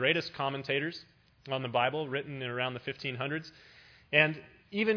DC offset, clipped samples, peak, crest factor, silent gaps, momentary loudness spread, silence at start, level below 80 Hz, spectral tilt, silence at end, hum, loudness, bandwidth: under 0.1%; under 0.1%; -8 dBFS; 26 dB; none; 13 LU; 0 s; -72 dBFS; -6 dB/octave; 0 s; none; -32 LUFS; 5.4 kHz